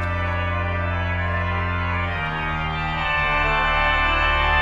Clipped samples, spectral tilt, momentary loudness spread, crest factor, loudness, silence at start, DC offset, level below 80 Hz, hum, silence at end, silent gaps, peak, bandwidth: under 0.1%; -6.5 dB/octave; 6 LU; 14 dB; -21 LUFS; 0 s; under 0.1%; -30 dBFS; none; 0 s; none; -6 dBFS; 7.6 kHz